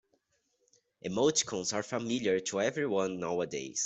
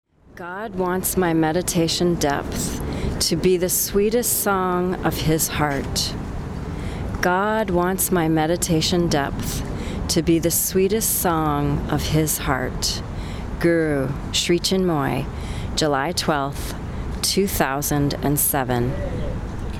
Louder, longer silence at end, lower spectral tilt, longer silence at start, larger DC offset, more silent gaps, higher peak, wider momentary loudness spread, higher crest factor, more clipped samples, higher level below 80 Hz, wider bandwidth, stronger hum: second, -32 LUFS vs -21 LUFS; about the same, 0 s vs 0 s; about the same, -3 dB/octave vs -4 dB/octave; first, 1.05 s vs 0.35 s; neither; neither; second, -14 dBFS vs -4 dBFS; second, 7 LU vs 11 LU; about the same, 18 dB vs 16 dB; neither; second, -72 dBFS vs -34 dBFS; second, 8.2 kHz vs over 20 kHz; neither